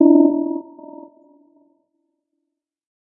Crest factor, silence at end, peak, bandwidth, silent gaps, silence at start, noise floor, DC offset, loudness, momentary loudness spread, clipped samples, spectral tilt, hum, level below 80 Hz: 20 dB; 2.45 s; 0 dBFS; 1.1 kHz; none; 0 s; -80 dBFS; under 0.1%; -17 LUFS; 27 LU; under 0.1%; -15.5 dB/octave; none; under -90 dBFS